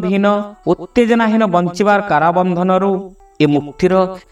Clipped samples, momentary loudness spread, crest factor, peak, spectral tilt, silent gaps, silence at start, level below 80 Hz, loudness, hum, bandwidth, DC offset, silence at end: under 0.1%; 6 LU; 14 dB; 0 dBFS; -7 dB/octave; none; 0 s; -46 dBFS; -15 LUFS; none; 11 kHz; under 0.1%; 0.1 s